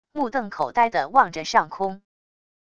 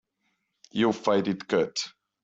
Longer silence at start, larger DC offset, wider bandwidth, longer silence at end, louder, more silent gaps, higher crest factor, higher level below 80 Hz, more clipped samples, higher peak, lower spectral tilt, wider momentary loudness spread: second, 0.15 s vs 0.75 s; first, 0.4% vs under 0.1%; about the same, 8.6 kHz vs 8 kHz; first, 0.75 s vs 0.35 s; first, -22 LUFS vs -27 LUFS; neither; about the same, 22 dB vs 18 dB; first, -60 dBFS vs -68 dBFS; neither; first, -2 dBFS vs -10 dBFS; about the same, -4 dB/octave vs -5 dB/octave; about the same, 9 LU vs 10 LU